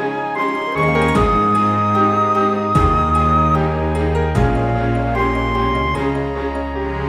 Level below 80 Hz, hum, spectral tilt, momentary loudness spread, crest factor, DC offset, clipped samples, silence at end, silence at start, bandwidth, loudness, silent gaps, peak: -26 dBFS; none; -7.5 dB/octave; 6 LU; 14 dB; under 0.1%; under 0.1%; 0 s; 0 s; 12 kHz; -17 LUFS; none; -4 dBFS